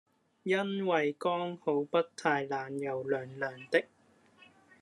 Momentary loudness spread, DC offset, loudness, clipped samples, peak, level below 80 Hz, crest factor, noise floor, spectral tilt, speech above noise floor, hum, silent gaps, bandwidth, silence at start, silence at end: 7 LU; under 0.1%; -33 LUFS; under 0.1%; -12 dBFS; -84 dBFS; 22 dB; -63 dBFS; -5.5 dB/octave; 31 dB; none; none; 11.5 kHz; 0.45 s; 0.95 s